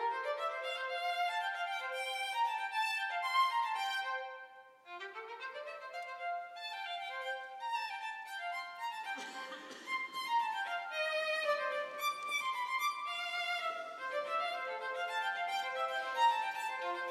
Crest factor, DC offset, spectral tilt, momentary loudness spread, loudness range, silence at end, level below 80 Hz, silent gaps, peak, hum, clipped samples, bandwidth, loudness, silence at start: 18 dB; under 0.1%; 1 dB/octave; 11 LU; 6 LU; 0 s; under -90 dBFS; none; -20 dBFS; none; under 0.1%; 16 kHz; -37 LUFS; 0 s